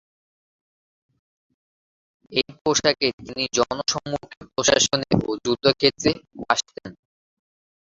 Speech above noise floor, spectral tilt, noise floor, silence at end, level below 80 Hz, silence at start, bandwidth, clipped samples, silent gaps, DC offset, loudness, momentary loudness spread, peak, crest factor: over 67 dB; -3 dB/octave; under -90 dBFS; 0.9 s; -52 dBFS; 2.3 s; 7.8 kHz; under 0.1%; 2.61-2.65 s, 3.13-3.18 s, 4.37-4.41 s; under 0.1%; -22 LUFS; 13 LU; 0 dBFS; 24 dB